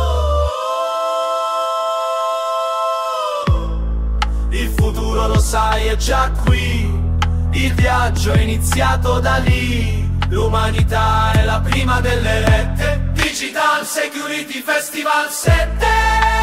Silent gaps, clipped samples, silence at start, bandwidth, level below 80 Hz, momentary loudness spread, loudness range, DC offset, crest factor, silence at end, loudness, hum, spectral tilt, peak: none; under 0.1%; 0 s; 16 kHz; -20 dBFS; 5 LU; 3 LU; under 0.1%; 14 dB; 0 s; -17 LUFS; none; -5 dB/octave; 0 dBFS